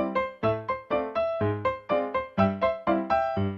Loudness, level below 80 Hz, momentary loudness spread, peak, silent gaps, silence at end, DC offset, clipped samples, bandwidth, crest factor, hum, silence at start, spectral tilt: -27 LUFS; -54 dBFS; 4 LU; -8 dBFS; none; 0 s; under 0.1%; under 0.1%; 7 kHz; 18 dB; none; 0 s; -9 dB/octave